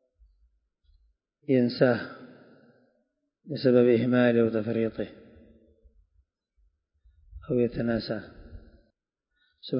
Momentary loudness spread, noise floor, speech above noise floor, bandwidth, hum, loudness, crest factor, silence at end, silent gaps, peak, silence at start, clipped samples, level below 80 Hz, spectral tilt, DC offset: 20 LU; -80 dBFS; 56 dB; 5.4 kHz; none; -25 LUFS; 20 dB; 0 s; none; -8 dBFS; 1.5 s; under 0.1%; -56 dBFS; -11 dB/octave; under 0.1%